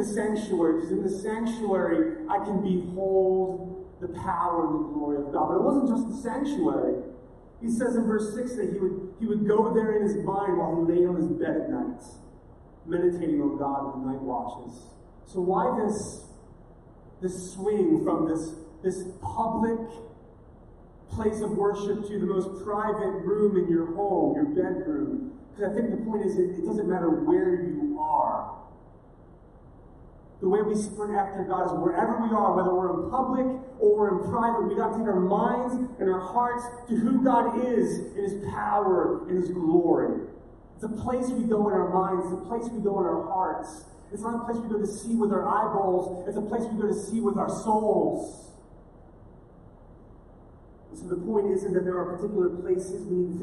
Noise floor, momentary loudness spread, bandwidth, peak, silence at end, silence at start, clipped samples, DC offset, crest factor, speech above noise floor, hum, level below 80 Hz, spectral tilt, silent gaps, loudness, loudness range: -51 dBFS; 10 LU; 11.5 kHz; -8 dBFS; 0 s; 0 s; under 0.1%; under 0.1%; 18 dB; 25 dB; none; -54 dBFS; -7.5 dB/octave; none; -27 LUFS; 5 LU